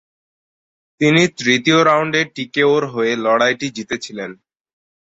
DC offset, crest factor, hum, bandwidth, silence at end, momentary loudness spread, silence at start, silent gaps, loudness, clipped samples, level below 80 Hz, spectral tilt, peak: under 0.1%; 16 dB; none; 8 kHz; 0.7 s; 12 LU; 1 s; none; -16 LUFS; under 0.1%; -60 dBFS; -4.5 dB/octave; -2 dBFS